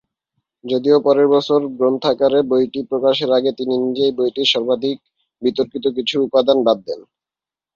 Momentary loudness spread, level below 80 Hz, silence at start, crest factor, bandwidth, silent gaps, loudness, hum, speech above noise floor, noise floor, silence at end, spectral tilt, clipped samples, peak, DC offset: 8 LU; -62 dBFS; 0.65 s; 16 dB; 7.4 kHz; none; -17 LUFS; none; 73 dB; -90 dBFS; 0.75 s; -5.5 dB/octave; under 0.1%; -2 dBFS; under 0.1%